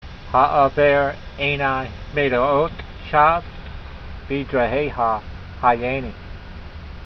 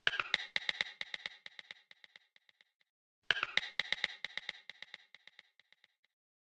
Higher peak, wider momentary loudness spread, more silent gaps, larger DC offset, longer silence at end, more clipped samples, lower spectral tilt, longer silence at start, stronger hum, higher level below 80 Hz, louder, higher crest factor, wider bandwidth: first, -2 dBFS vs -10 dBFS; about the same, 21 LU vs 21 LU; second, none vs 2.76-2.80 s, 2.90-3.22 s; neither; second, 0 s vs 1.6 s; neither; first, -7.5 dB/octave vs -0.5 dB/octave; about the same, 0 s vs 0.05 s; neither; first, -36 dBFS vs -78 dBFS; first, -20 LUFS vs -37 LUFS; second, 18 dB vs 32 dB; second, 6.2 kHz vs 10.5 kHz